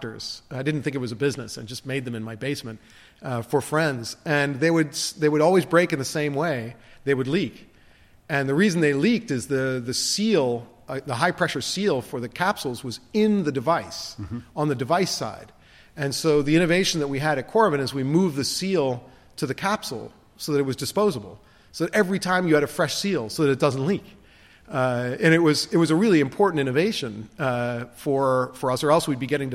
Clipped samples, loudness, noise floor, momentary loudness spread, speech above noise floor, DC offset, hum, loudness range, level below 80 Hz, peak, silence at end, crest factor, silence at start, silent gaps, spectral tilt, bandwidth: under 0.1%; -23 LUFS; -54 dBFS; 13 LU; 30 dB; under 0.1%; none; 4 LU; -56 dBFS; -4 dBFS; 0 s; 18 dB; 0 s; none; -5 dB/octave; 16 kHz